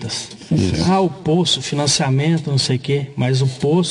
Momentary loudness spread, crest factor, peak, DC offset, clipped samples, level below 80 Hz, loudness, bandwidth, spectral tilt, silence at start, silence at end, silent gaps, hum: 5 LU; 14 dB; -4 dBFS; under 0.1%; under 0.1%; -48 dBFS; -18 LUFS; 10.5 kHz; -5 dB/octave; 0 s; 0 s; none; none